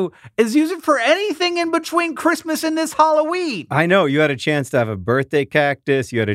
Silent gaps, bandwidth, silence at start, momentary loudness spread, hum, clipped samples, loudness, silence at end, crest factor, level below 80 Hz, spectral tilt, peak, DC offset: none; 16 kHz; 0 s; 5 LU; none; under 0.1%; -18 LUFS; 0 s; 16 dB; -58 dBFS; -5 dB/octave; -2 dBFS; under 0.1%